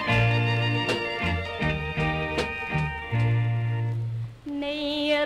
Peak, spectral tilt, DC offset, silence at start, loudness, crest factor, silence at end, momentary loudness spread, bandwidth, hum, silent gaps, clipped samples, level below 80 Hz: -10 dBFS; -6.5 dB/octave; under 0.1%; 0 s; -26 LUFS; 16 dB; 0 s; 8 LU; 9.8 kHz; none; none; under 0.1%; -42 dBFS